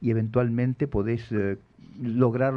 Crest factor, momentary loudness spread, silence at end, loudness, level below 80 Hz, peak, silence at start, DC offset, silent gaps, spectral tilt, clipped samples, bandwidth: 18 dB; 7 LU; 0 s; -26 LUFS; -50 dBFS; -8 dBFS; 0 s; under 0.1%; none; -10.5 dB/octave; under 0.1%; 5.6 kHz